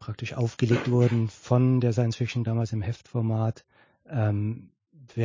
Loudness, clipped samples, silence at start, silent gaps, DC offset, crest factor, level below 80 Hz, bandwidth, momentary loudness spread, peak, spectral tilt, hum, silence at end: -26 LUFS; under 0.1%; 0 s; none; under 0.1%; 18 dB; -54 dBFS; 7.6 kHz; 11 LU; -8 dBFS; -8 dB/octave; none; 0 s